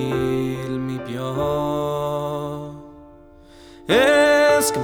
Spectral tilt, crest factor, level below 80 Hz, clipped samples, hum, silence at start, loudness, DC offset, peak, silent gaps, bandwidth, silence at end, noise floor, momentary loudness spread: -4.5 dB/octave; 16 dB; -46 dBFS; under 0.1%; none; 0 s; -20 LUFS; under 0.1%; -4 dBFS; none; 20 kHz; 0 s; -46 dBFS; 17 LU